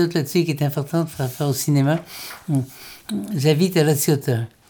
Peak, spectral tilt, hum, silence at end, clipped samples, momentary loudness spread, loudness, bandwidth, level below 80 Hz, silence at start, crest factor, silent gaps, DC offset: -4 dBFS; -5.5 dB/octave; none; 0.25 s; under 0.1%; 12 LU; -21 LUFS; over 20 kHz; -62 dBFS; 0 s; 16 dB; none; under 0.1%